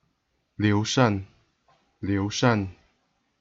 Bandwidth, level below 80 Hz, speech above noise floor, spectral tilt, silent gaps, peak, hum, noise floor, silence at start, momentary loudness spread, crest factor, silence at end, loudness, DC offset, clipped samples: 7.8 kHz; -60 dBFS; 50 dB; -5.5 dB/octave; none; -8 dBFS; none; -73 dBFS; 0.6 s; 11 LU; 20 dB; 0.7 s; -25 LUFS; under 0.1%; under 0.1%